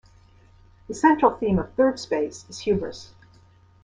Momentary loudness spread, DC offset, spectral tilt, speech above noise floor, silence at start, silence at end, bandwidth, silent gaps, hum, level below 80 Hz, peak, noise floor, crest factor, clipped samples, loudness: 16 LU; under 0.1%; -6 dB/octave; 32 dB; 0.9 s; 0.8 s; 10 kHz; none; none; -50 dBFS; -4 dBFS; -54 dBFS; 22 dB; under 0.1%; -23 LUFS